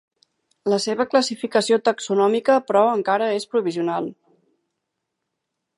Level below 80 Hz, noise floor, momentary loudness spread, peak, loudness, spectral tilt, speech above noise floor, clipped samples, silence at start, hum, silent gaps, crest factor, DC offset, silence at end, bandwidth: -74 dBFS; -80 dBFS; 7 LU; -4 dBFS; -20 LUFS; -4 dB/octave; 60 dB; under 0.1%; 0.65 s; none; none; 18 dB; under 0.1%; 1.65 s; 11.5 kHz